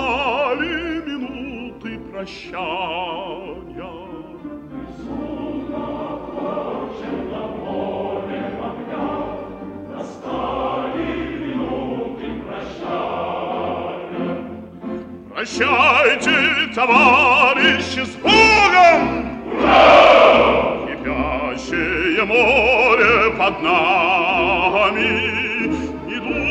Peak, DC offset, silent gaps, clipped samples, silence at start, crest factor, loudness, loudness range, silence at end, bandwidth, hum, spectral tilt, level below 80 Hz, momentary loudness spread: 0 dBFS; under 0.1%; none; under 0.1%; 0 s; 18 dB; -16 LUFS; 16 LU; 0 s; 9.8 kHz; none; -4 dB/octave; -42 dBFS; 20 LU